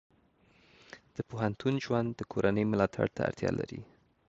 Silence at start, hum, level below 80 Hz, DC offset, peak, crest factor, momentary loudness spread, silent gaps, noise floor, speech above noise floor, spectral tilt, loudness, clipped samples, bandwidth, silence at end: 0.95 s; none; -58 dBFS; under 0.1%; -12 dBFS; 20 dB; 16 LU; none; -66 dBFS; 35 dB; -7.5 dB/octave; -32 LUFS; under 0.1%; 8 kHz; 0.45 s